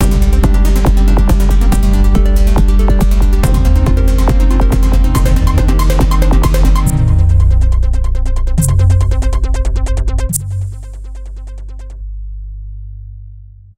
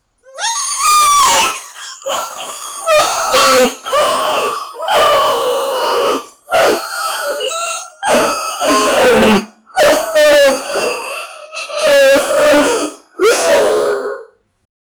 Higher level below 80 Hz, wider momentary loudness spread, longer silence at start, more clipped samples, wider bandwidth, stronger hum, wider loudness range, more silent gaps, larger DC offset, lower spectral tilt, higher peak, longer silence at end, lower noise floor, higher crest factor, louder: first, -10 dBFS vs -46 dBFS; first, 18 LU vs 13 LU; second, 0 s vs 0.35 s; neither; second, 16.5 kHz vs over 20 kHz; neither; first, 9 LU vs 3 LU; neither; neither; first, -6.5 dB/octave vs -1.5 dB/octave; about the same, 0 dBFS vs -2 dBFS; second, 0.3 s vs 0.75 s; about the same, -34 dBFS vs -36 dBFS; about the same, 10 dB vs 12 dB; about the same, -13 LUFS vs -12 LUFS